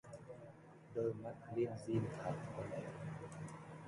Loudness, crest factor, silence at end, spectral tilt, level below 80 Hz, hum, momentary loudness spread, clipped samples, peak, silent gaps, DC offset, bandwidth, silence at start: -45 LUFS; 18 dB; 0 s; -7.5 dB/octave; -72 dBFS; none; 15 LU; under 0.1%; -26 dBFS; none; under 0.1%; 11.5 kHz; 0.05 s